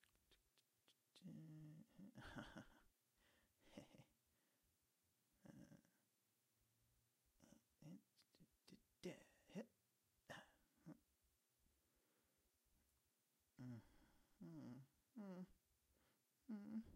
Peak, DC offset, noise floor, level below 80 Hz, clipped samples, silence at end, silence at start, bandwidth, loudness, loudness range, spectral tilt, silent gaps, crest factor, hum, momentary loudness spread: -42 dBFS; under 0.1%; -88 dBFS; -84 dBFS; under 0.1%; 0 s; 0 s; 15.5 kHz; -62 LUFS; 5 LU; -6 dB/octave; none; 22 dB; none; 9 LU